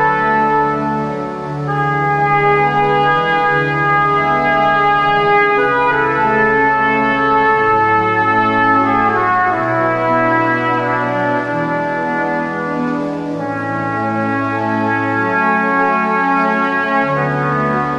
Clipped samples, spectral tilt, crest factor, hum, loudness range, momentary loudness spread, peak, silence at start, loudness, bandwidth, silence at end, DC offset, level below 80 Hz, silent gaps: under 0.1%; -7 dB/octave; 12 dB; none; 5 LU; 7 LU; -2 dBFS; 0 s; -14 LUFS; 9 kHz; 0 s; under 0.1%; -46 dBFS; none